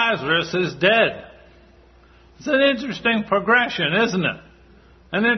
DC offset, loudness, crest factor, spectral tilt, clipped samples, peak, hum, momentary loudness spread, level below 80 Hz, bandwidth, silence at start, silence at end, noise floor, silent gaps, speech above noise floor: under 0.1%; -19 LUFS; 18 dB; -5 dB/octave; under 0.1%; -2 dBFS; none; 9 LU; -54 dBFS; 6.4 kHz; 0 s; 0 s; -50 dBFS; none; 31 dB